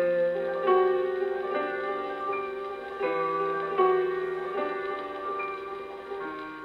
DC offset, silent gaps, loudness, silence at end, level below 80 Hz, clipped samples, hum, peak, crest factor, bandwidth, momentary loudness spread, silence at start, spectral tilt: under 0.1%; none; -29 LUFS; 0 s; -66 dBFS; under 0.1%; none; -10 dBFS; 18 dB; 5.2 kHz; 12 LU; 0 s; -6.5 dB/octave